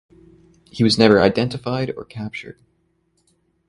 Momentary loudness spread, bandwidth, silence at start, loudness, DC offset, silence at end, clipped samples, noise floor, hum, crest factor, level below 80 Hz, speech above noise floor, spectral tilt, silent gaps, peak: 20 LU; 11.5 kHz; 0.75 s; -18 LUFS; under 0.1%; 1.15 s; under 0.1%; -65 dBFS; none; 22 dB; -50 dBFS; 47 dB; -6 dB/octave; none; 0 dBFS